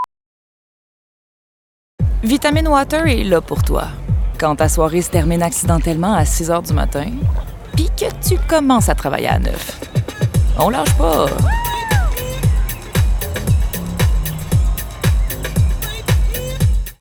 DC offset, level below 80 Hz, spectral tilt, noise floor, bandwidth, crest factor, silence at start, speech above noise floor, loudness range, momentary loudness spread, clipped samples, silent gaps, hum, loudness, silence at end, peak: under 0.1%; -20 dBFS; -5.5 dB/octave; under -90 dBFS; 19 kHz; 16 dB; 0 s; over 75 dB; 2 LU; 7 LU; under 0.1%; 0.26-1.98 s; none; -17 LUFS; 0.05 s; 0 dBFS